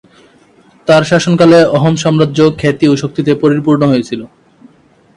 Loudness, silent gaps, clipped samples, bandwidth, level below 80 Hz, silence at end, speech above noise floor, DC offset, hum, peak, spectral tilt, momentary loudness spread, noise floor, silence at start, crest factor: -10 LUFS; none; under 0.1%; 11 kHz; -48 dBFS; 0.9 s; 37 dB; under 0.1%; none; 0 dBFS; -6.5 dB/octave; 8 LU; -47 dBFS; 0.85 s; 12 dB